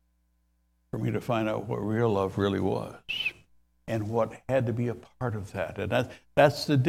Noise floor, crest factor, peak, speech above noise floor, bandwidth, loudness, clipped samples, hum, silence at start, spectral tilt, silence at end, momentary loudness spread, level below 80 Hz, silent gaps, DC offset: -70 dBFS; 22 dB; -6 dBFS; 43 dB; 15.5 kHz; -29 LUFS; under 0.1%; none; 0.95 s; -6.5 dB/octave; 0 s; 11 LU; -58 dBFS; none; under 0.1%